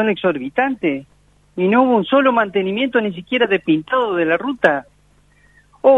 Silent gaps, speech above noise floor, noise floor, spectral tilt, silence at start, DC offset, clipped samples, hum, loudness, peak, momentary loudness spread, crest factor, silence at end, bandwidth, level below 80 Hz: none; 37 dB; -54 dBFS; -7.5 dB/octave; 0 s; under 0.1%; under 0.1%; 50 Hz at -45 dBFS; -17 LUFS; 0 dBFS; 7 LU; 16 dB; 0 s; 7 kHz; -58 dBFS